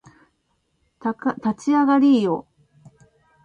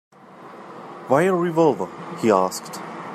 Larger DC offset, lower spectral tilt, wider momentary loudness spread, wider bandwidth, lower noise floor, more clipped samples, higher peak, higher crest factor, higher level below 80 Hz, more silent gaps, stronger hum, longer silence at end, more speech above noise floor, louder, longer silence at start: neither; about the same, -6.5 dB/octave vs -6 dB/octave; second, 13 LU vs 21 LU; second, 8.6 kHz vs 15 kHz; first, -70 dBFS vs -42 dBFS; neither; about the same, -6 dBFS vs -4 dBFS; about the same, 16 dB vs 18 dB; about the same, -66 dBFS vs -70 dBFS; neither; neither; first, 1.05 s vs 0 s; first, 51 dB vs 22 dB; about the same, -20 LUFS vs -21 LUFS; first, 1.05 s vs 0.3 s